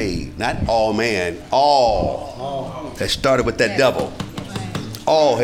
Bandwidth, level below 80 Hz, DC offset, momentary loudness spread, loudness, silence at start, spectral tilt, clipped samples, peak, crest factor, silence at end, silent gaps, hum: 17.5 kHz; -36 dBFS; under 0.1%; 12 LU; -19 LUFS; 0 s; -4.5 dB/octave; under 0.1%; -2 dBFS; 16 dB; 0 s; none; none